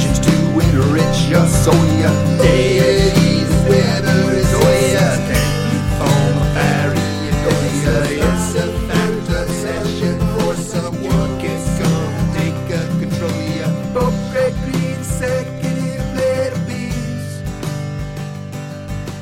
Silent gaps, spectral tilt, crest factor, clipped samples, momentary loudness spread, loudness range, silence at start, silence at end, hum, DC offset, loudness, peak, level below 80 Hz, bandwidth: none; -6 dB/octave; 14 dB; under 0.1%; 10 LU; 7 LU; 0 s; 0 s; none; under 0.1%; -16 LUFS; -2 dBFS; -28 dBFS; 16.5 kHz